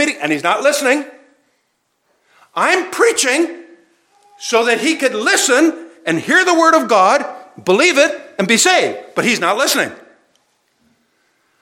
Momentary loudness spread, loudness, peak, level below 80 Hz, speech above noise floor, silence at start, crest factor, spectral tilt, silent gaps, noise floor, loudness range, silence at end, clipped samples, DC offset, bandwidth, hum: 10 LU; -14 LUFS; 0 dBFS; -76 dBFS; 52 dB; 0 s; 16 dB; -2 dB/octave; none; -66 dBFS; 5 LU; 1.65 s; under 0.1%; under 0.1%; 17.5 kHz; none